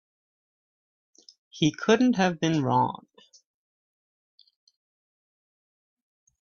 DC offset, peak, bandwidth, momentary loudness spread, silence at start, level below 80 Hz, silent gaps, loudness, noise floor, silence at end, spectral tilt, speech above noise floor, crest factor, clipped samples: under 0.1%; -6 dBFS; 7.2 kHz; 7 LU; 1.55 s; -68 dBFS; none; -24 LUFS; under -90 dBFS; 3.55 s; -5.5 dB/octave; over 66 dB; 22 dB; under 0.1%